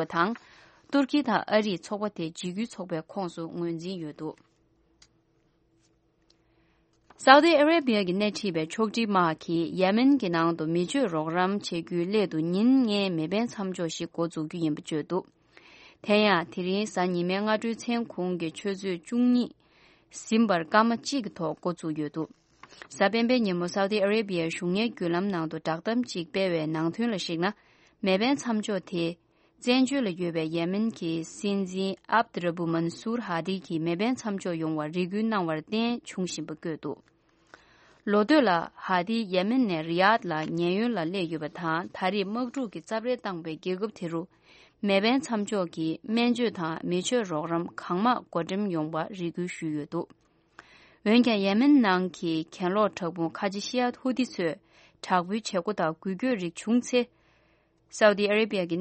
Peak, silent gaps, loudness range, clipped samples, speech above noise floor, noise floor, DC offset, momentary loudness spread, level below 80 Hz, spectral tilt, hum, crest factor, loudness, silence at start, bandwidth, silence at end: 0 dBFS; none; 6 LU; under 0.1%; 41 dB; -68 dBFS; under 0.1%; 11 LU; -70 dBFS; -5.5 dB/octave; none; 28 dB; -27 LUFS; 0 s; 8.4 kHz; 0 s